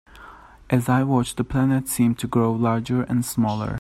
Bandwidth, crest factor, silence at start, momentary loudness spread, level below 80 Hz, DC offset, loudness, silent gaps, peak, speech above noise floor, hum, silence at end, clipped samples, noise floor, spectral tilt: 16 kHz; 16 dB; 0.15 s; 4 LU; -46 dBFS; under 0.1%; -22 LUFS; none; -4 dBFS; 24 dB; none; 0 s; under 0.1%; -45 dBFS; -6.5 dB/octave